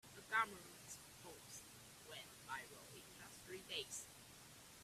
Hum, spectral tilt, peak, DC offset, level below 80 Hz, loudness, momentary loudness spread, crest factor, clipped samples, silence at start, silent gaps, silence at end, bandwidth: none; -1.5 dB/octave; -24 dBFS; under 0.1%; -78 dBFS; -50 LUFS; 17 LU; 28 dB; under 0.1%; 0.05 s; none; 0 s; 15.5 kHz